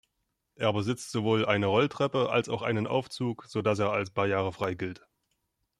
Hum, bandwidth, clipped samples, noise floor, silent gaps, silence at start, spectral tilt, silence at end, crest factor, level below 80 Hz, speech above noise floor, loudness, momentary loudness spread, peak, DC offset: none; 13.5 kHz; under 0.1%; -80 dBFS; none; 0.6 s; -6 dB/octave; 0.85 s; 20 dB; -66 dBFS; 52 dB; -29 LUFS; 7 LU; -10 dBFS; under 0.1%